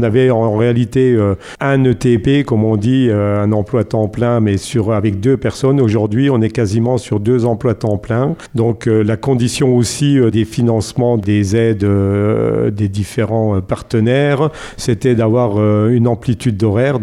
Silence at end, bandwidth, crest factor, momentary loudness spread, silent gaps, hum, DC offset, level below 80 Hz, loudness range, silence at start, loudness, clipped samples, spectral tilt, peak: 0 s; 12.5 kHz; 12 dB; 5 LU; none; none; under 0.1%; -42 dBFS; 2 LU; 0 s; -14 LUFS; under 0.1%; -7 dB/octave; -2 dBFS